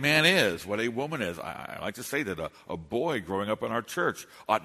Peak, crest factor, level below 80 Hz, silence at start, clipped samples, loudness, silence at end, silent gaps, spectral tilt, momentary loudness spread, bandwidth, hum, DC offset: -8 dBFS; 22 dB; -62 dBFS; 0 s; under 0.1%; -29 LUFS; 0 s; none; -4 dB/octave; 15 LU; 13.5 kHz; none; under 0.1%